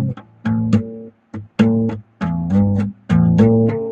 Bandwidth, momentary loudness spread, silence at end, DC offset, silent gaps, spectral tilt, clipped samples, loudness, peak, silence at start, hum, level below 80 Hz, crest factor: 7.6 kHz; 17 LU; 0 s; under 0.1%; none; -9.5 dB/octave; under 0.1%; -17 LUFS; 0 dBFS; 0 s; none; -42 dBFS; 16 dB